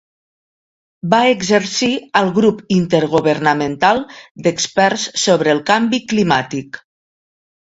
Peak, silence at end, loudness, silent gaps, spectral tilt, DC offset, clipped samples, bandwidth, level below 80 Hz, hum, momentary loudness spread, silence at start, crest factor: 0 dBFS; 1 s; -15 LUFS; 4.31-4.35 s; -4.5 dB/octave; under 0.1%; under 0.1%; 8 kHz; -54 dBFS; none; 7 LU; 1.05 s; 16 dB